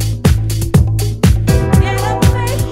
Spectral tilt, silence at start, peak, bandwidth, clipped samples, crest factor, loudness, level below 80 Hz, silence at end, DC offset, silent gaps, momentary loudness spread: -6 dB/octave; 0 s; 0 dBFS; 16.5 kHz; 0.2%; 12 dB; -13 LUFS; -18 dBFS; 0 s; under 0.1%; none; 4 LU